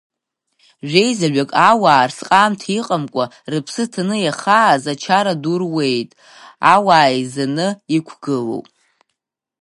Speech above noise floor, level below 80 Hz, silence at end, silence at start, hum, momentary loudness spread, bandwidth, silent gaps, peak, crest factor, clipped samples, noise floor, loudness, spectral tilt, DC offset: 60 dB; -66 dBFS; 1 s; 0.85 s; none; 11 LU; 11.5 kHz; none; 0 dBFS; 16 dB; under 0.1%; -76 dBFS; -16 LUFS; -4.5 dB/octave; under 0.1%